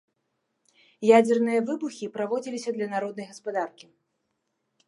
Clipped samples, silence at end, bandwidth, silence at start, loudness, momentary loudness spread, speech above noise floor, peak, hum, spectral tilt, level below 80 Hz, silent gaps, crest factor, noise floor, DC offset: under 0.1%; 1.2 s; 11.5 kHz; 1 s; -26 LUFS; 14 LU; 53 dB; -6 dBFS; none; -5.5 dB/octave; -82 dBFS; none; 22 dB; -78 dBFS; under 0.1%